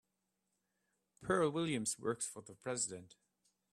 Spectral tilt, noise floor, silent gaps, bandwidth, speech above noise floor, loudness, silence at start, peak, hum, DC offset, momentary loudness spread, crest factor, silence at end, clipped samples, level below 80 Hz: -4 dB/octave; -86 dBFS; none; 14 kHz; 47 dB; -38 LUFS; 1.2 s; -20 dBFS; none; under 0.1%; 13 LU; 20 dB; 0.65 s; under 0.1%; -74 dBFS